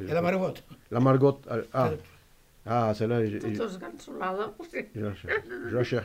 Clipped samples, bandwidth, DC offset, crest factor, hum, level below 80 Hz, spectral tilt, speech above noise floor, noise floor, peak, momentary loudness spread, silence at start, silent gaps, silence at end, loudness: under 0.1%; 16 kHz; under 0.1%; 18 dB; none; -60 dBFS; -8 dB/octave; 29 dB; -57 dBFS; -10 dBFS; 13 LU; 0 s; none; 0 s; -29 LUFS